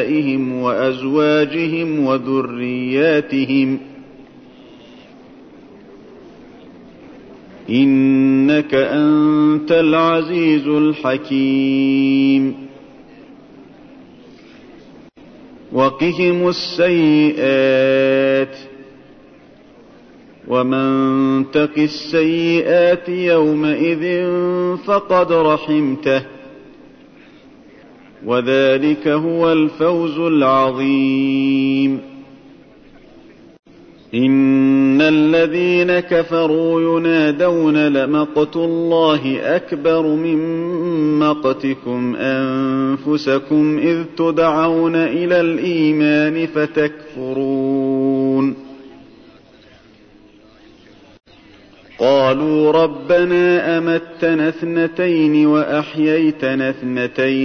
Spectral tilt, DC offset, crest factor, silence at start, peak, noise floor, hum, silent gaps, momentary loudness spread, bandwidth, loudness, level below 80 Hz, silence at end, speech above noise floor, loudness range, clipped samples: -7.5 dB/octave; under 0.1%; 12 dB; 0 s; -4 dBFS; -46 dBFS; none; 33.59-33.63 s; 6 LU; 6.4 kHz; -15 LUFS; -56 dBFS; 0 s; 31 dB; 6 LU; under 0.1%